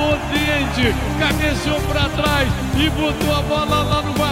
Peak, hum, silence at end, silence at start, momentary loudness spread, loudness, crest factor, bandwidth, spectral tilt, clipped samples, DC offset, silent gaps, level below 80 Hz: -4 dBFS; none; 0 s; 0 s; 2 LU; -18 LUFS; 14 dB; 16.5 kHz; -5 dB/octave; under 0.1%; under 0.1%; none; -28 dBFS